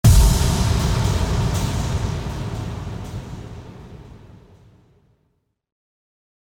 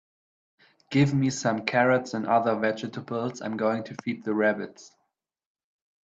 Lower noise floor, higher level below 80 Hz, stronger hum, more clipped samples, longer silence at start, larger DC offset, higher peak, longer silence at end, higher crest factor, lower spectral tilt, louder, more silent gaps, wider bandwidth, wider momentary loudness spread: second, -69 dBFS vs -80 dBFS; first, -24 dBFS vs -68 dBFS; neither; neither; second, 0.05 s vs 0.9 s; neither; first, -2 dBFS vs -6 dBFS; first, 2.4 s vs 1.15 s; about the same, 18 dB vs 20 dB; about the same, -5.5 dB/octave vs -6 dB/octave; first, -21 LUFS vs -26 LUFS; neither; first, 18.5 kHz vs 8 kHz; first, 22 LU vs 10 LU